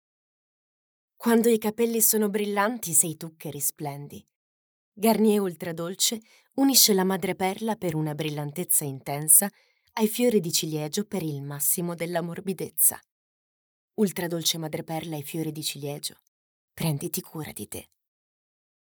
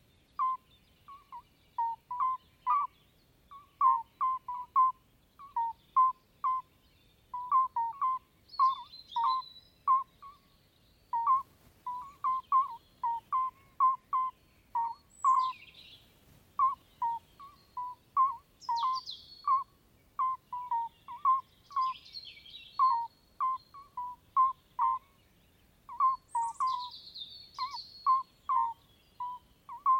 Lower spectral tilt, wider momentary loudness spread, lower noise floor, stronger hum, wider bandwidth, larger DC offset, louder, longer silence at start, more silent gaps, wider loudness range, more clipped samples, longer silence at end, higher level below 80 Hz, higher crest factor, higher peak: first, -3.5 dB/octave vs -1.5 dB/octave; about the same, 16 LU vs 16 LU; first, under -90 dBFS vs -66 dBFS; neither; first, over 20 kHz vs 16 kHz; neither; first, -24 LUFS vs -33 LUFS; first, 1.2 s vs 0.4 s; first, 4.36-4.92 s, 13.11-13.88 s, 16.28-16.68 s vs none; first, 7 LU vs 3 LU; neither; first, 1.05 s vs 0 s; about the same, -72 dBFS vs -72 dBFS; first, 24 dB vs 18 dB; first, -4 dBFS vs -16 dBFS